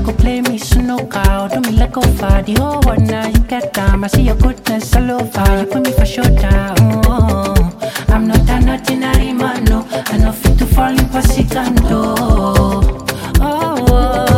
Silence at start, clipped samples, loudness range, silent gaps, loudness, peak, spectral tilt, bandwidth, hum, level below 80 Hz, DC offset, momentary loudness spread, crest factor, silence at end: 0 s; under 0.1%; 1 LU; none; -14 LUFS; 0 dBFS; -6 dB/octave; 17 kHz; none; -16 dBFS; under 0.1%; 4 LU; 12 dB; 0 s